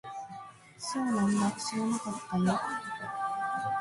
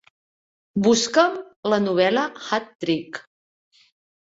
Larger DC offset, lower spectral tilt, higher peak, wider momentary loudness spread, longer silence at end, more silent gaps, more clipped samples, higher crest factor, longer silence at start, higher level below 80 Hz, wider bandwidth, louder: neither; about the same, -5 dB/octave vs -4 dB/octave; second, -16 dBFS vs -2 dBFS; about the same, 14 LU vs 12 LU; second, 0 s vs 1 s; second, none vs 1.56-1.63 s, 2.75-2.79 s; neither; about the same, 16 dB vs 20 dB; second, 0.05 s vs 0.75 s; about the same, -66 dBFS vs -64 dBFS; first, 11.5 kHz vs 8 kHz; second, -32 LUFS vs -21 LUFS